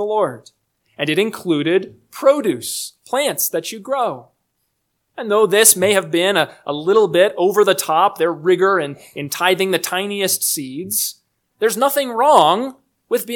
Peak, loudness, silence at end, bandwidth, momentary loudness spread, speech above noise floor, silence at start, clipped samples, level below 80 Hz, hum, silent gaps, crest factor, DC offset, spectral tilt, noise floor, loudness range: 0 dBFS; -17 LUFS; 0 s; 19 kHz; 11 LU; 54 dB; 0 s; under 0.1%; -70 dBFS; none; none; 18 dB; under 0.1%; -2.5 dB/octave; -71 dBFS; 5 LU